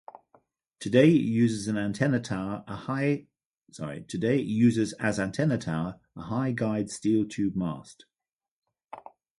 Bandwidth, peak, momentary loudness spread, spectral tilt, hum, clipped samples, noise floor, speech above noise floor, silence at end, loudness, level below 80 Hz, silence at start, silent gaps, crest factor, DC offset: 11.5 kHz; -8 dBFS; 16 LU; -6.5 dB/octave; none; under 0.1%; under -90 dBFS; over 64 dB; 0.4 s; -27 LUFS; -60 dBFS; 0.8 s; 3.46-3.51 s, 8.33-8.39 s, 8.48-8.62 s; 20 dB; under 0.1%